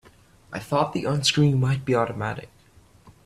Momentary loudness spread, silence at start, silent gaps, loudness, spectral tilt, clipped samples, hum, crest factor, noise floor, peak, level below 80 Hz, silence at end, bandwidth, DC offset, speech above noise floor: 17 LU; 0.5 s; none; -23 LUFS; -5.5 dB/octave; under 0.1%; none; 18 dB; -55 dBFS; -6 dBFS; -54 dBFS; 0.15 s; 14 kHz; under 0.1%; 32 dB